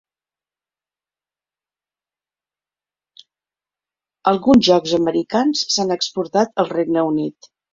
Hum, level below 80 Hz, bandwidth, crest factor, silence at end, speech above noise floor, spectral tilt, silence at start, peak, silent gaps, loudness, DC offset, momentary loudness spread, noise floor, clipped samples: 50 Hz at -55 dBFS; -54 dBFS; 7.8 kHz; 20 dB; 0.4 s; over 73 dB; -4.5 dB/octave; 4.25 s; -2 dBFS; none; -17 LUFS; under 0.1%; 8 LU; under -90 dBFS; under 0.1%